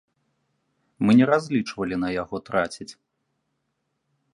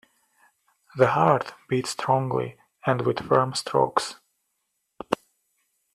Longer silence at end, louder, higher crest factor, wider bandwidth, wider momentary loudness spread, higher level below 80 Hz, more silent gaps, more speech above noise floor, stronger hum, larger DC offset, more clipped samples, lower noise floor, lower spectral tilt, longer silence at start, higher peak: first, 1.4 s vs 0.8 s; about the same, -23 LUFS vs -25 LUFS; about the same, 20 dB vs 24 dB; second, 11 kHz vs 13.5 kHz; about the same, 13 LU vs 11 LU; first, -58 dBFS vs -64 dBFS; neither; about the same, 54 dB vs 53 dB; neither; neither; neither; about the same, -76 dBFS vs -77 dBFS; about the same, -6.5 dB/octave vs -5.5 dB/octave; about the same, 1 s vs 0.95 s; second, -6 dBFS vs -2 dBFS